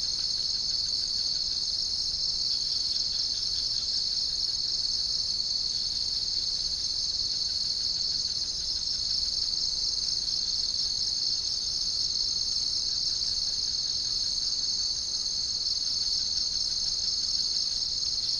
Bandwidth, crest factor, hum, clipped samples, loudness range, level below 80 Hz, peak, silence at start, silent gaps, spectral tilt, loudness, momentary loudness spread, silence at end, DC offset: 10.5 kHz; 14 dB; none; under 0.1%; 1 LU; -50 dBFS; -14 dBFS; 0 s; none; 0.5 dB/octave; -26 LUFS; 1 LU; 0 s; under 0.1%